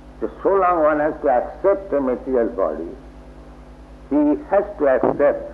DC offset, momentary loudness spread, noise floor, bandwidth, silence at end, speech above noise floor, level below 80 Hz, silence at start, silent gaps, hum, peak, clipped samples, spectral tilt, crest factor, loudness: under 0.1%; 7 LU; -41 dBFS; 4.9 kHz; 0 s; 22 dB; -42 dBFS; 0 s; none; 50 Hz at -45 dBFS; -2 dBFS; under 0.1%; -9 dB/octave; 16 dB; -19 LUFS